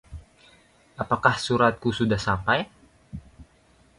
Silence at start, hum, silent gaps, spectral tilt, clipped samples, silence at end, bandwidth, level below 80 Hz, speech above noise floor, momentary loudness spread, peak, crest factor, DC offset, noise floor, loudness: 0.1 s; none; none; -5.5 dB/octave; under 0.1%; 0.55 s; 11.5 kHz; -48 dBFS; 36 dB; 22 LU; -2 dBFS; 24 dB; under 0.1%; -59 dBFS; -24 LUFS